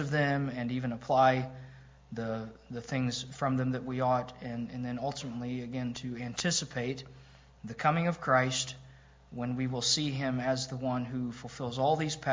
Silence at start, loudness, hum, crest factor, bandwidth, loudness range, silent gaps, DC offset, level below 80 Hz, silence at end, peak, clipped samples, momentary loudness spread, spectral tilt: 0 s; -32 LUFS; none; 20 dB; 7.8 kHz; 3 LU; none; under 0.1%; -60 dBFS; 0 s; -12 dBFS; under 0.1%; 14 LU; -4.5 dB/octave